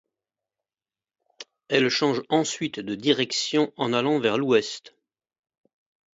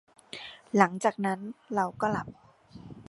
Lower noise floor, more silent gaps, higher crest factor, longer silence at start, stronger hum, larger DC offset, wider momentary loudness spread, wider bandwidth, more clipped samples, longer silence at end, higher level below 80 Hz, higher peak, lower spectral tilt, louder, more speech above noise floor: first, under -90 dBFS vs -49 dBFS; neither; second, 20 dB vs 26 dB; first, 1.4 s vs 0.35 s; neither; neither; second, 8 LU vs 19 LU; second, 8 kHz vs 11.5 kHz; neither; first, 1.35 s vs 0.05 s; second, -72 dBFS vs -64 dBFS; about the same, -6 dBFS vs -4 dBFS; second, -4 dB/octave vs -5.5 dB/octave; first, -24 LUFS vs -29 LUFS; first, over 66 dB vs 21 dB